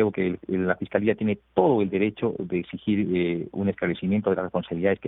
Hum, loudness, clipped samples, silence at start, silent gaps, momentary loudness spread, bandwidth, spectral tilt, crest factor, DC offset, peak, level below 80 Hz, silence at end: none; -25 LUFS; under 0.1%; 0 s; none; 6 LU; 4 kHz; -11.5 dB/octave; 20 dB; under 0.1%; -6 dBFS; -58 dBFS; 0 s